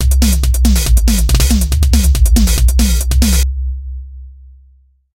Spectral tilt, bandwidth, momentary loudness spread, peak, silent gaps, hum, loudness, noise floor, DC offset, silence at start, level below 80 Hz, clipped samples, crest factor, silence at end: -4.5 dB/octave; 16.5 kHz; 12 LU; 0 dBFS; none; none; -13 LUFS; -48 dBFS; under 0.1%; 0 s; -12 dBFS; under 0.1%; 12 dB; 0.85 s